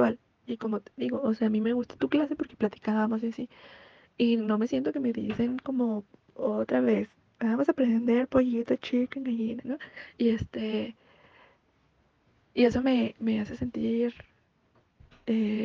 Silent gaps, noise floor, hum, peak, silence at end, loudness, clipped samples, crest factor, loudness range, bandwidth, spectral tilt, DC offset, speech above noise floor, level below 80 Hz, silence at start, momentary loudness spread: none; -68 dBFS; none; -10 dBFS; 0 s; -29 LUFS; under 0.1%; 18 dB; 4 LU; 7 kHz; -7.5 dB/octave; under 0.1%; 40 dB; -60 dBFS; 0 s; 10 LU